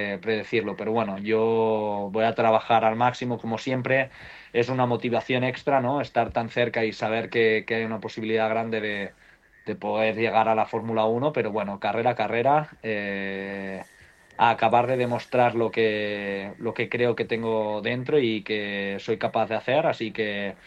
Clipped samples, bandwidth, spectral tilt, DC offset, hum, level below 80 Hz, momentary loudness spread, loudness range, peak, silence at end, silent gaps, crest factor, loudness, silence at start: under 0.1%; 9 kHz; -6.5 dB/octave; under 0.1%; none; -62 dBFS; 8 LU; 2 LU; -6 dBFS; 0.1 s; none; 18 dB; -25 LUFS; 0 s